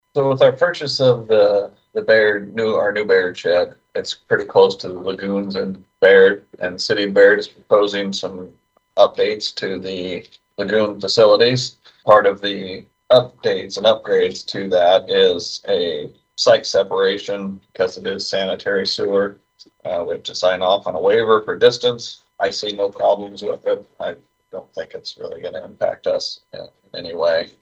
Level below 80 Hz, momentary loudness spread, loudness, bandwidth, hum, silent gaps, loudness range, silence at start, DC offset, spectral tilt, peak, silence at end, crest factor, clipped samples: -60 dBFS; 16 LU; -17 LUFS; 8.2 kHz; none; none; 7 LU; 0.15 s; under 0.1%; -4 dB/octave; 0 dBFS; 0.15 s; 18 dB; under 0.1%